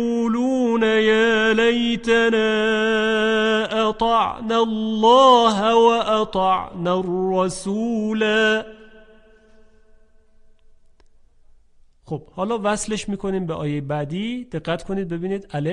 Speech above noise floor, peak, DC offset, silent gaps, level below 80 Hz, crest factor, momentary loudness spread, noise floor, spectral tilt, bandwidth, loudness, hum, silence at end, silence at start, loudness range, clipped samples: 33 dB; -4 dBFS; under 0.1%; none; -50 dBFS; 16 dB; 11 LU; -52 dBFS; -5 dB/octave; 11 kHz; -19 LUFS; none; 0 s; 0 s; 11 LU; under 0.1%